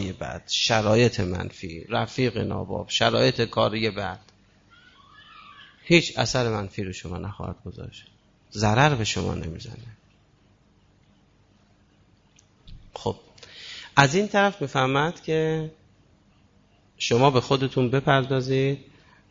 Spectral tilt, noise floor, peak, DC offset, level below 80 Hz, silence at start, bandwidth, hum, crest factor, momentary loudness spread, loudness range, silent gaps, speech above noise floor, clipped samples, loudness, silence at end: -5 dB/octave; -60 dBFS; -4 dBFS; under 0.1%; -52 dBFS; 0 s; 7.8 kHz; 50 Hz at -55 dBFS; 22 dB; 19 LU; 6 LU; none; 36 dB; under 0.1%; -24 LUFS; 0.5 s